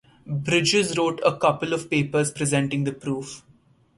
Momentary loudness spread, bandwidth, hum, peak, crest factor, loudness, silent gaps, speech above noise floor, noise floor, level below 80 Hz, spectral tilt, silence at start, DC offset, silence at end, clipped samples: 11 LU; 11.5 kHz; none; -4 dBFS; 20 dB; -23 LUFS; none; 35 dB; -58 dBFS; -58 dBFS; -4.5 dB/octave; 0.25 s; under 0.1%; 0.6 s; under 0.1%